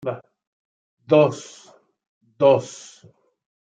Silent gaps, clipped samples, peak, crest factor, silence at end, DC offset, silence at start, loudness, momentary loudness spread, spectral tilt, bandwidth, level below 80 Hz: 0.47-0.98 s, 2.07-2.21 s; under 0.1%; -4 dBFS; 20 dB; 1 s; under 0.1%; 0.05 s; -19 LUFS; 22 LU; -6 dB/octave; 9 kHz; -72 dBFS